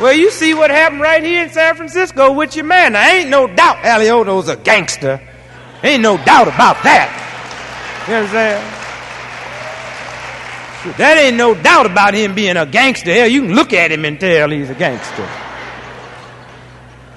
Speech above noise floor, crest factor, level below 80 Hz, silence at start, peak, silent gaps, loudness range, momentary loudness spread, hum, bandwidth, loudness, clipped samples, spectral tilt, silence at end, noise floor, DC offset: 26 dB; 12 dB; -48 dBFS; 0 s; 0 dBFS; none; 7 LU; 18 LU; none; 12 kHz; -10 LUFS; 0.1%; -3.5 dB/octave; 0.4 s; -37 dBFS; under 0.1%